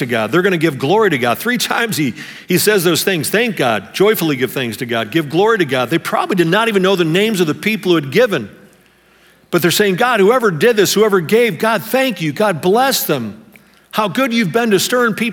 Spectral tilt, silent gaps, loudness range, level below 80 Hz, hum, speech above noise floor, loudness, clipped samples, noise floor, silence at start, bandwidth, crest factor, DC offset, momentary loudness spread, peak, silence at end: -4.5 dB/octave; none; 2 LU; -62 dBFS; none; 36 dB; -14 LUFS; under 0.1%; -50 dBFS; 0 s; over 20 kHz; 14 dB; under 0.1%; 7 LU; 0 dBFS; 0 s